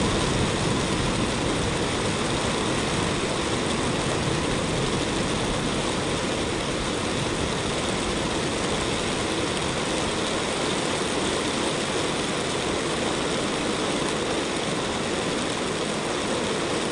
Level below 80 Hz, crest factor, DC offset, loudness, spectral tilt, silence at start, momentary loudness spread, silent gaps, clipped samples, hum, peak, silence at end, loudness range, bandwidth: -42 dBFS; 14 dB; under 0.1%; -25 LUFS; -4 dB/octave; 0 s; 2 LU; none; under 0.1%; none; -10 dBFS; 0 s; 1 LU; 11.5 kHz